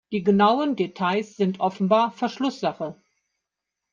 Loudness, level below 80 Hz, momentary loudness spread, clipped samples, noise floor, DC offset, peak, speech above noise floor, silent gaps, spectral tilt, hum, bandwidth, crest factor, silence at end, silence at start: -23 LUFS; -68 dBFS; 9 LU; under 0.1%; -84 dBFS; under 0.1%; -6 dBFS; 62 dB; none; -7 dB/octave; none; 7.4 kHz; 18 dB; 1 s; 0.1 s